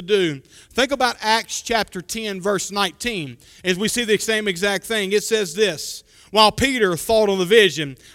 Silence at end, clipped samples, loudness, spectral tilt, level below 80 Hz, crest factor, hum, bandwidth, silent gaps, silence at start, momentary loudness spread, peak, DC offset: 0.2 s; under 0.1%; -19 LUFS; -3 dB/octave; -48 dBFS; 20 dB; none; 16.5 kHz; none; 0 s; 12 LU; 0 dBFS; under 0.1%